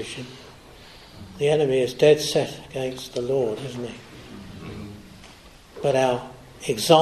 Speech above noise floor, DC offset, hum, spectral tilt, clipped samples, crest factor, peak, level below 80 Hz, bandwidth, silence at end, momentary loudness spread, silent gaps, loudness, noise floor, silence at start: 26 dB; under 0.1%; none; -4.5 dB/octave; under 0.1%; 24 dB; 0 dBFS; -54 dBFS; 13 kHz; 0 s; 26 LU; none; -23 LUFS; -47 dBFS; 0 s